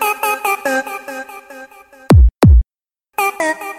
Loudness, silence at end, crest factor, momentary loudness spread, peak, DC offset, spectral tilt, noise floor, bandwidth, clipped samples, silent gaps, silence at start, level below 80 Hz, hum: -14 LUFS; 0 s; 12 dB; 21 LU; -2 dBFS; under 0.1%; -6 dB/octave; under -90 dBFS; 16.5 kHz; under 0.1%; none; 0 s; -18 dBFS; none